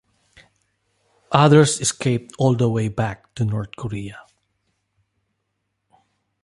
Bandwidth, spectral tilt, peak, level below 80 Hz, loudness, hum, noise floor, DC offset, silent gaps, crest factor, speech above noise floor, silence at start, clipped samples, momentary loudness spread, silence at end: 11.5 kHz; -5.5 dB/octave; 0 dBFS; -52 dBFS; -19 LUFS; none; -75 dBFS; under 0.1%; none; 22 dB; 56 dB; 1.3 s; under 0.1%; 16 LU; 2.25 s